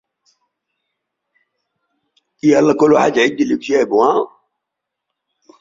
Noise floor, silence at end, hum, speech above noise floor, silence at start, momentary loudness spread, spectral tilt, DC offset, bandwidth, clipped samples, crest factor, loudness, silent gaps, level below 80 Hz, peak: -80 dBFS; 1.35 s; none; 67 dB; 2.45 s; 7 LU; -5.5 dB/octave; under 0.1%; 7.6 kHz; under 0.1%; 18 dB; -14 LUFS; none; -60 dBFS; 0 dBFS